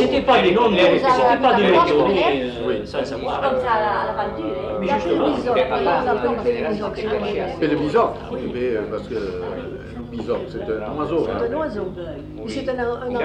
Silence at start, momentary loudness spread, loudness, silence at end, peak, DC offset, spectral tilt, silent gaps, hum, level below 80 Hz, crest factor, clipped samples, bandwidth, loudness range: 0 s; 13 LU; -20 LUFS; 0 s; -2 dBFS; under 0.1%; -6.5 dB/octave; none; 50 Hz at -60 dBFS; -42 dBFS; 16 dB; under 0.1%; 9.8 kHz; 8 LU